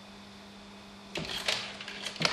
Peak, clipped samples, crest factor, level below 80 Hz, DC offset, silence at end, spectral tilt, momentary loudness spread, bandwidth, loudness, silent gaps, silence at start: -8 dBFS; under 0.1%; 30 dB; -62 dBFS; under 0.1%; 0 s; -2 dB/octave; 18 LU; 15 kHz; -34 LUFS; none; 0 s